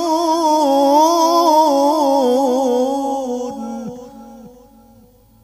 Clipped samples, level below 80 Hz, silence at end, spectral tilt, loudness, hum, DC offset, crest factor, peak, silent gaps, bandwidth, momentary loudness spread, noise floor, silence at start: under 0.1%; -56 dBFS; 0.95 s; -3.5 dB/octave; -15 LUFS; none; under 0.1%; 14 dB; -2 dBFS; none; 16 kHz; 15 LU; -48 dBFS; 0 s